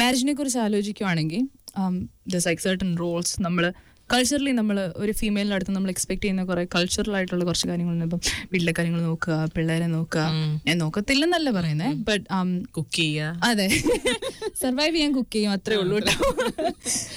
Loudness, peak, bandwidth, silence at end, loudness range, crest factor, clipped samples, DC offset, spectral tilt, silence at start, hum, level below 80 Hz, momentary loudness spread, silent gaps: -24 LUFS; -10 dBFS; 19.5 kHz; 0 s; 2 LU; 14 dB; under 0.1%; under 0.1%; -4.5 dB/octave; 0 s; none; -46 dBFS; 6 LU; none